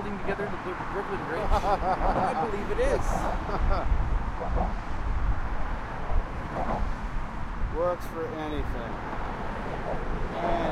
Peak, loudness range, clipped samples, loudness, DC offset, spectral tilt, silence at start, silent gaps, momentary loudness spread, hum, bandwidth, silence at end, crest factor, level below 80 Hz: -12 dBFS; 5 LU; under 0.1%; -31 LUFS; under 0.1%; -6.5 dB/octave; 0 s; none; 8 LU; none; 11.5 kHz; 0 s; 16 dB; -32 dBFS